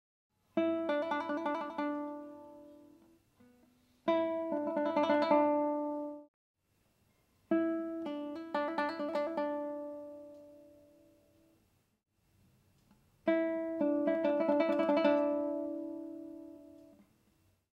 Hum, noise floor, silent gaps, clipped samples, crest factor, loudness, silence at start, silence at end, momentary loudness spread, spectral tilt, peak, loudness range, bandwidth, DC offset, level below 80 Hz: none; -74 dBFS; 6.28-6.54 s; under 0.1%; 20 dB; -34 LUFS; 0.55 s; 0.95 s; 20 LU; -6.5 dB/octave; -16 dBFS; 9 LU; 7.2 kHz; under 0.1%; -80 dBFS